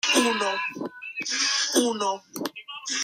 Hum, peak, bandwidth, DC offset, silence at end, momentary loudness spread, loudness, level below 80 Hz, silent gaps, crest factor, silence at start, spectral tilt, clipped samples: none; -8 dBFS; 16 kHz; under 0.1%; 0 s; 13 LU; -25 LUFS; -78 dBFS; none; 18 dB; 0.05 s; -1 dB/octave; under 0.1%